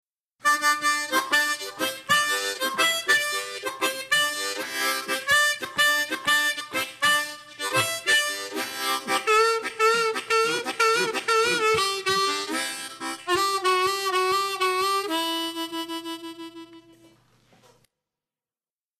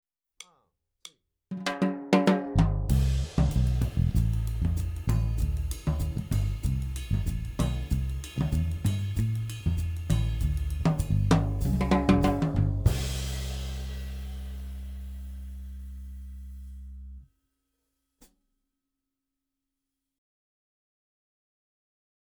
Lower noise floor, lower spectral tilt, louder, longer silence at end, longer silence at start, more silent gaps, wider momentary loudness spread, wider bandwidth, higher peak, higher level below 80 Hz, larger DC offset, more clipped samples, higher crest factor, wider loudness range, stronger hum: first, under -90 dBFS vs -86 dBFS; second, -1 dB/octave vs -7 dB/octave; first, -23 LUFS vs -28 LUFS; second, 2.2 s vs 5 s; about the same, 0.45 s vs 0.4 s; neither; second, 10 LU vs 18 LU; second, 14 kHz vs over 20 kHz; second, -10 dBFS vs -6 dBFS; second, -68 dBFS vs -34 dBFS; neither; neither; second, 16 dB vs 24 dB; second, 6 LU vs 16 LU; neither